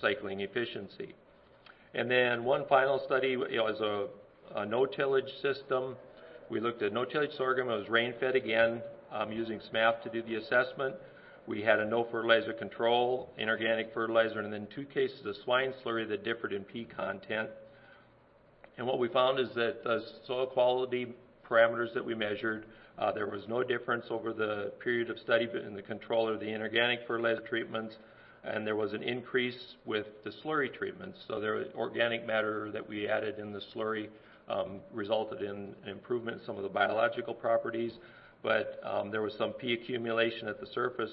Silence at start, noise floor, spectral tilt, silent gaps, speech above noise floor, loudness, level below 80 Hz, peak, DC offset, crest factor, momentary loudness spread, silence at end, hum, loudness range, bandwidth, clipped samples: 0 s; -62 dBFS; -8.5 dB/octave; none; 30 dB; -33 LUFS; -72 dBFS; -10 dBFS; under 0.1%; 24 dB; 12 LU; 0 s; none; 5 LU; 5.6 kHz; under 0.1%